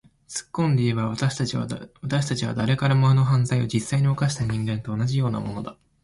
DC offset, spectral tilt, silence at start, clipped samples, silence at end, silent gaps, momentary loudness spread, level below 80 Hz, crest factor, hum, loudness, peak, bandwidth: under 0.1%; -6 dB/octave; 0.3 s; under 0.1%; 0.3 s; none; 13 LU; -50 dBFS; 14 dB; none; -24 LUFS; -10 dBFS; 11.5 kHz